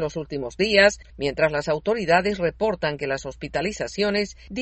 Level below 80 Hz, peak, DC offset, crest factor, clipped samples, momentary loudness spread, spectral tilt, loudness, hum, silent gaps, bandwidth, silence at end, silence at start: -46 dBFS; -2 dBFS; under 0.1%; 20 dB; under 0.1%; 12 LU; -4.5 dB/octave; -23 LUFS; none; none; 8.4 kHz; 0 s; 0 s